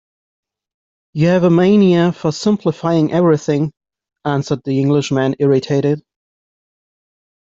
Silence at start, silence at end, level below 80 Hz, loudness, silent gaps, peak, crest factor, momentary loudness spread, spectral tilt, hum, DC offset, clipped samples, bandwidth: 1.15 s; 1.6 s; -56 dBFS; -15 LUFS; none; -2 dBFS; 14 dB; 9 LU; -7.5 dB/octave; none; under 0.1%; under 0.1%; 7.8 kHz